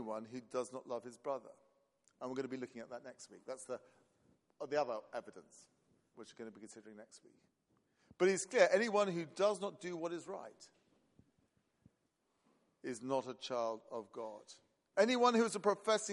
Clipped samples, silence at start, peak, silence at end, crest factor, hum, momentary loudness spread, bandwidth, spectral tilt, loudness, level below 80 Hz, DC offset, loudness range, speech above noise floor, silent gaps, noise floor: under 0.1%; 0 s; -16 dBFS; 0 s; 24 dB; none; 23 LU; 11.5 kHz; -4 dB/octave; -38 LUFS; -88 dBFS; under 0.1%; 13 LU; 44 dB; none; -82 dBFS